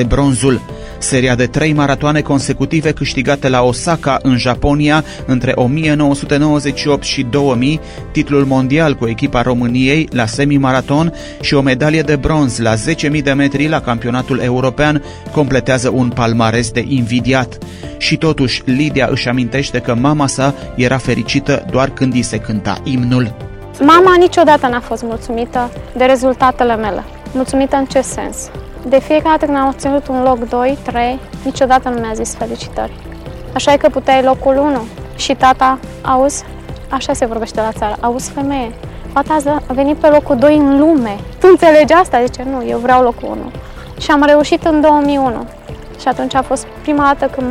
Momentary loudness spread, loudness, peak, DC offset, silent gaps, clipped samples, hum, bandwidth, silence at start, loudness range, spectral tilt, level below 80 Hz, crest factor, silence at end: 11 LU; -13 LUFS; 0 dBFS; under 0.1%; none; under 0.1%; none; 13.5 kHz; 0 s; 4 LU; -5.5 dB/octave; -32 dBFS; 12 dB; 0 s